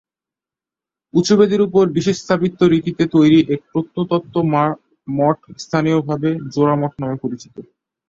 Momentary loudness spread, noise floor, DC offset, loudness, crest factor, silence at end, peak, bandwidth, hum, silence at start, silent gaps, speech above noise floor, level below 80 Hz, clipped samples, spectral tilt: 11 LU; -89 dBFS; under 0.1%; -17 LUFS; 16 dB; 0.45 s; -2 dBFS; 7.8 kHz; none; 1.15 s; none; 72 dB; -54 dBFS; under 0.1%; -7 dB/octave